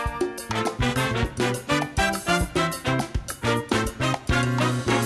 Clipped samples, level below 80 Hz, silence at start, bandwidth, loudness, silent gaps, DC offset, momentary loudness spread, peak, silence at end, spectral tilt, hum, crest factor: under 0.1%; -36 dBFS; 0 s; 13 kHz; -24 LUFS; none; under 0.1%; 5 LU; -8 dBFS; 0 s; -4.5 dB/octave; none; 18 dB